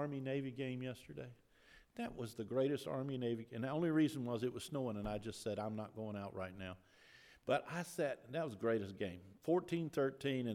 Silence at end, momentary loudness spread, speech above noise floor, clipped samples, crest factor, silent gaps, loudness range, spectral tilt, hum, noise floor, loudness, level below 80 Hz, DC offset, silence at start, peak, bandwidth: 0 s; 12 LU; 25 dB; under 0.1%; 18 dB; none; 4 LU; -6.5 dB/octave; none; -66 dBFS; -41 LUFS; -68 dBFS; under 0.1%; 0 s; -22 dBFS; 16.5 kHz